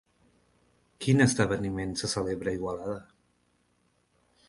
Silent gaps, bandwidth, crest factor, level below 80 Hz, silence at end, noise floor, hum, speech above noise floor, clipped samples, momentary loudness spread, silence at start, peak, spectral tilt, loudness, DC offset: none; 11.5 kHz; 22 dB; -54 dBFS; 1.45 s; -71 dBFS; 60 Hz at -55 dBFS; 43 dB; under 0.1%; 13 LU; 1 s; -8 dBFS; -5 dB/octave; -28 LUFS; under 0.1%